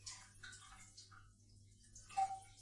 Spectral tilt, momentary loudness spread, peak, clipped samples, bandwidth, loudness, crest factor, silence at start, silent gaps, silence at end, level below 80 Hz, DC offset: -1.5 dB/octave; 24 LU; -28 dBFS; under 0.1%; 11.5 kHz; -47 LUFS; 22 dB; 0 s; none; 0 s; -70 dBFS; under 0.1%